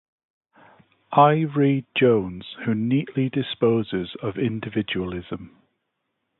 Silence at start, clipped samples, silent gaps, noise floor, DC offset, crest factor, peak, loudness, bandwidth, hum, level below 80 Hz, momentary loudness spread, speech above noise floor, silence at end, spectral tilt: 1.1 s; under 0.1%; none; -77 dBFS; under 0.1%; 20 dB; -4 dBFS; -23 LUFS; 4.2 kHz; none; -56 dBFS; 13 LU; 55 dB; 0.9 s; -11.5 dB/octave